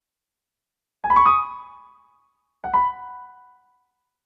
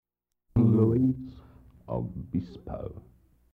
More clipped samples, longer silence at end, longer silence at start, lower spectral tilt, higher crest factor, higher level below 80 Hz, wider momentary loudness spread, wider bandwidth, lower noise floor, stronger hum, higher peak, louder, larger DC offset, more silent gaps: neither; first, 1 s vs 0.55 s; first, 1.05 s vs 0.55 s; second, -5.5 dB/octave vs -12 dB/octave; about the same, 20 dB vs 18 dB; second, -54 dBFS vs -48 dBFS; first, 24 LU vs 18 LU; first, 6 kHz vs 4.6 kHz; first, -87 dBFS vs -71 dBFS; neither; first, -4 dBFS vs -12 dBFS; first, -20 LUFS vs -28 LUFS; neither; neither